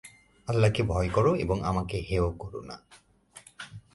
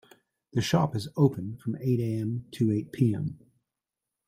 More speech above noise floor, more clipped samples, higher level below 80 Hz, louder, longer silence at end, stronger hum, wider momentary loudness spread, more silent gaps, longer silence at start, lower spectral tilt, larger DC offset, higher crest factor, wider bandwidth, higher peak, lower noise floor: second, 27 dB vs 61 dB; neither; first, -42 dBFS vs -62 dBFS; about the same, -27 LUFS vs -28 LUFS; second, 0.15 s vs 0.9 s; neither; first, 20 LU vs 8 LU; neither; second, 0.05 s vs 0.55 s; about the same, -7 dB/octave vs -7 dB/octave; neither; about the same, 18 dB vs 20 dB; second, 11.5 kHz vs 15.5 kHz; about the same, -10 dBFS vs -10 dBFS; second, -54 dBFS vs -88 dBFS